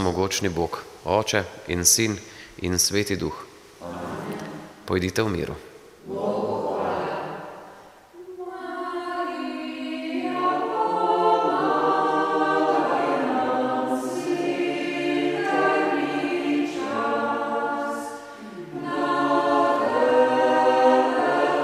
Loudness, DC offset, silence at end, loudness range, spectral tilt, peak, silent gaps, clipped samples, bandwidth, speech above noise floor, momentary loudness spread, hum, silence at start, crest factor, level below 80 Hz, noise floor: -23 LUFS; under 0.1%; 0 s; 8 LU; -3.5 dB/octave; -4 dBFS; none; under 0.1%; 16 kHz; 23 dB; 16 LU; none; 0 s; 20 dB; -54 dBFS; -47 dBFS